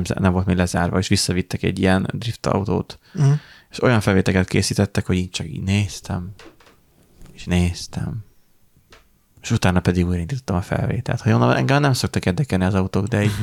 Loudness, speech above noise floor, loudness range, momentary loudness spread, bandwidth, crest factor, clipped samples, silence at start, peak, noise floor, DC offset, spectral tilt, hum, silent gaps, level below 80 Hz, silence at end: -20 LUFS; 36 dB; 6 LU; 11 LU; 15 kHz; 16 dB; under 0.1%; 0 s; -4 dBFS; -56 dBFS; under 0.1%; -6 dB/octave; none; none; -42 dBFS; 0 s